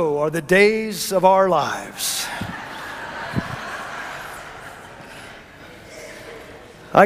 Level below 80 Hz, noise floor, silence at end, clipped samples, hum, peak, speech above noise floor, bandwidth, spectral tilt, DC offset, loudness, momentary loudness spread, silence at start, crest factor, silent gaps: -52 dBFS; -42 dBFS; 0 s; under 0.1%; none; 0 dBFS; 23 dB; 16 kHz; -4 dB/octave; under 0.1%; -21 LUFS; 24 LU; 0 s; 22 dB; none